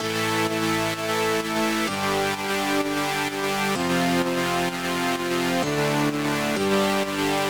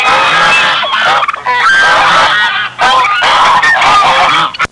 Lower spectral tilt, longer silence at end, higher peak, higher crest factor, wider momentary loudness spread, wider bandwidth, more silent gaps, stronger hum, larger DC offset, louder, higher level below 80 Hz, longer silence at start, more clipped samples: first, -4 dB/octave vs -1 dB/octave; about the same, 0 s vs 0.05 s; second, -10 dBFS vs 0 dBFS; first, 14 dB vs 8 dB; about the same, 3 LU vs 4 LU; first, over 20 kHz vs 11.5 kHz; neither; neither; second, 0.2% vs 0.5%; second, -23 LUFS vs -7 LUFS; second, -56 dBFS vs -42 dBFS; about the same, 0 s vs 0 s; neither